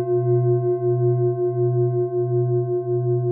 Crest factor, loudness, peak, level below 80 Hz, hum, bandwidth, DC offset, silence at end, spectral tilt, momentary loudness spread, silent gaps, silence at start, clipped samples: 10 dB; -21 LUFS; -10 dBFS; -72 dBFS; none; 1.6 kHz; under 0.1%; 0 s; -17.5 dB/octave; 3 LU; none; 0 s; under 0.1%